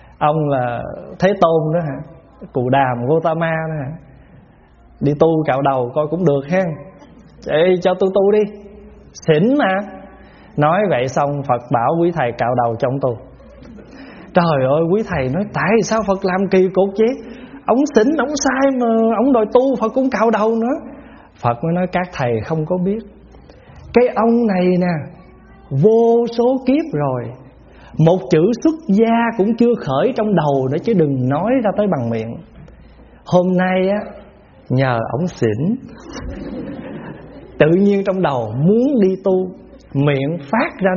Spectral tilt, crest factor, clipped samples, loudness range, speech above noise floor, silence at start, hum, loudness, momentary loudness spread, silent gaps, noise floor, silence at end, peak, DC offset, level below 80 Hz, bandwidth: -6.5 dB/octave; 16 dB; under 0.1%; 4 LU; 31 dB; 0.2 s; none; -16 LUFS; 14 LU; none; -46 dBFS; 0 s; 0 dBFS; under 0.1%; -46 dBFS; 7.2 kHz